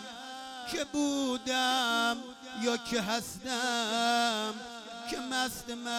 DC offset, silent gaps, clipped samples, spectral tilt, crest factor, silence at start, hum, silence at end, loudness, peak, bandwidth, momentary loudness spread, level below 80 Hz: under 0.1%; none; under 0.1%; -2 dB/octave; 16 dB; 0 s; none; 0 s; -31 LUFS; -16 dBFS; 17.5 kHz; 14 LU; -64 dBFS